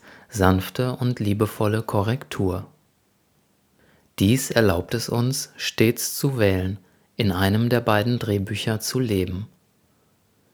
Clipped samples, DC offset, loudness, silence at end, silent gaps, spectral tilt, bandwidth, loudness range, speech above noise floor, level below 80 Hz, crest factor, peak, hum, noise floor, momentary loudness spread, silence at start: under 0.1%; under 0.1%; -23 LUFS; 1.1 s; none; -5.5 dB/octave; over 20 kHz; 4 LU; 43 dB; -52 dBFS; 22 dB; 0 dBFS; none; -64 dBFS; 9 LU; 0.05 s